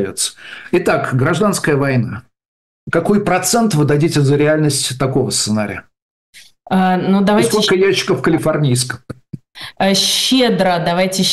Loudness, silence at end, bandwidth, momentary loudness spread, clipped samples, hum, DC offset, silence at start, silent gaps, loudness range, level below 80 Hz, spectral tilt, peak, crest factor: -14 LUFS; 0 s; 13 kHz; 12 LU; under 0.1%; none; under 0.1%; 0 s; 2.48-2.87 s, 6.02-6.33 s; 1 LU; -48 dBFS; -4.5 dB/octave; -6 dBFS; 10 dB